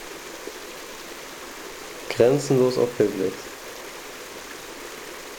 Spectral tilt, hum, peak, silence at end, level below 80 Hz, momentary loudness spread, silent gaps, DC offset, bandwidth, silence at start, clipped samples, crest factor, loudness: -5 dB/octave; none; -6 dBFS; 0 s; -58 dBFS; 17 LU; none; under 0.1%; over 20 kHz; 0 s; under 0.1%; 20 dB; -26 LUFS